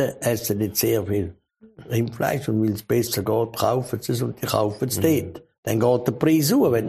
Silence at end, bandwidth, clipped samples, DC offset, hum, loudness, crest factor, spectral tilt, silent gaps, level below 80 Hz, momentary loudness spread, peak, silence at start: 0 s; 15.5 kHz; under 0.1%; under 0.1%; none; -22 LUFS; 18 dB; -5.5 dB/octave; 5.58-5.63 s; -54 dBFS; 7 LU; -4 dBFS; 0 s